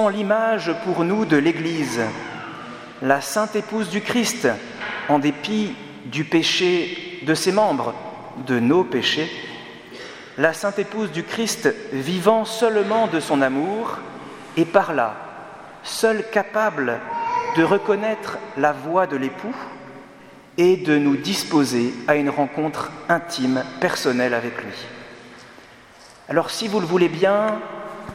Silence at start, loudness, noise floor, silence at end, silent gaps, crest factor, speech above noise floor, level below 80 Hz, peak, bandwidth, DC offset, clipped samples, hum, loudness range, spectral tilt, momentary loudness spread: 0 s; -21 LUFS; -46 dBFS; 0 s; none; 22 dB; 26 dB; -64 dBFS; 0 dBFS; 16.5 kHz; under 0.1%; under 0.1%; none; 3 LU; -4.5 dB/octave; 16 LU